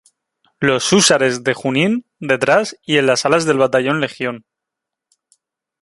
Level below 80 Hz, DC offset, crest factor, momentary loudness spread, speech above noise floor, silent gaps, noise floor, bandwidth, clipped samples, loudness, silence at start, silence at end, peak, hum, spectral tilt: -58 dBFS; under 0.1%; 18 dB; 9 LU; 67 dB; none; -82 dBFS; 11.5 kHz; under 0.1%; -16 LUFS; 0.6 s; 1.45 s; 0 dBFS; none; -3.5 dB/octave